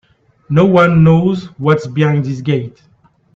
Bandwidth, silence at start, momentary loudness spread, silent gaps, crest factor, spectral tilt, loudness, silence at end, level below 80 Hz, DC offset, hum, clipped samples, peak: 7.4 kHz; 0.5 s; 9 LU; none; 14 dB; -8.5 dB/octave; -13 LUFS; 0.65 s; -46 dBFS; under 0.1%; none; under 0.1%; 0 dBFS